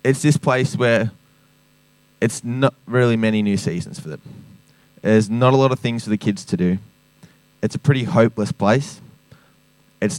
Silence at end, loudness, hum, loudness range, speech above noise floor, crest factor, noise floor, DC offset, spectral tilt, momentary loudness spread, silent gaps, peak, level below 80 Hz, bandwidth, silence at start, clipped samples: 0 s; -19 LUFS; none; 2 LU; 38 dB; 18 dB; -56 dBFS; under 0.1%; -6.5 dB/octave; 11 LU; none; -2 dBFS; -58 dBFS; 13.5 kHz; 0.05 s; under 0.1%